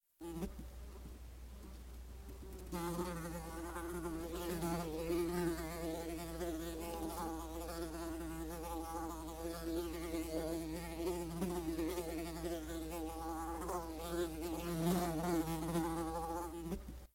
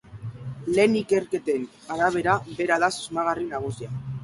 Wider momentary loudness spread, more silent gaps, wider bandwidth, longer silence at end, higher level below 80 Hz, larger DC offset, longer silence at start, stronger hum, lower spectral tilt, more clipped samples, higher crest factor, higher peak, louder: about the same, 14 LU vs 13 LU; neither; first, 16 kHz vs 11.5 kHz; about the same, 0.1 s vs 0 s; about the same, -52 dBFS vs -56 dBFS; neither; about the same, 0.2 s vs 0.1 s; neither; about the same, -5.5 dB/octave vs -5.5 dB/octave; neither; about the same, 18 dB vs 18 dB; second, -24 dBFS vs -6 dBFS; second, -42 LUFS vs -25 LUFS